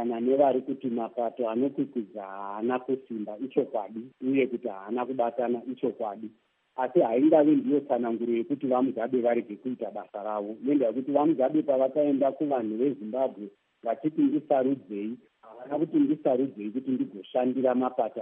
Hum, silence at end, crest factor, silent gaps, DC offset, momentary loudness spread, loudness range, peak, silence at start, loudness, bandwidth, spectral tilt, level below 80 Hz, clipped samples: none; 0 s; 18 dB; none; under 0.1%; 12 LU; 5 LU; -8 dBFS; 0 s; -28 LUFS; 3.7 kHz; -6.5 dB/octave; -86 dBFS; under 0.1%